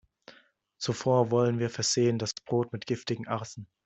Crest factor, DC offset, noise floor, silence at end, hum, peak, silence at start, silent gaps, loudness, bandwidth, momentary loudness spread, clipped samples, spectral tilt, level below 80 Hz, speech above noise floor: 18 dB; under 0.1%; -62 dBFS; 0.2 s; none; -10 dBFS; 0.8 s; none; -29 LUFS; 8.2 kHz; 10 LU; under 0.1%; -5 dB/octave; -68 dBFS; 33 dB